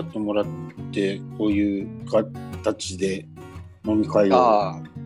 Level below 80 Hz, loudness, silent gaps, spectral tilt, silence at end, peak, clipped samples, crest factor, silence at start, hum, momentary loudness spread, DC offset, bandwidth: -52 dBFS; -23 LUFS; none; -6 dB/octave; 0 s; -4 dBFS; under 0.1%; 20 dB; 0 s; none; 15 LU; under 0.1%; 11.5 kHz